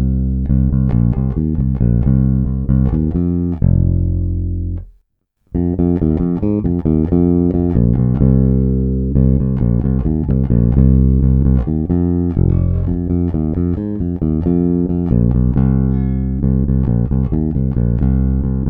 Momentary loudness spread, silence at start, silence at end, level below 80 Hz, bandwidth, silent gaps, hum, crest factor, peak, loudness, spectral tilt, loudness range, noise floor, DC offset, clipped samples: 5 LU; 0 s; 0 s; -20 dBFS; 2.5 kHz; none; none; 14 dB; 0 dBFS; -16 LUFS; -14 dB/octave; 3 LU; -62 dBFS; under 0.1%; under 0.1%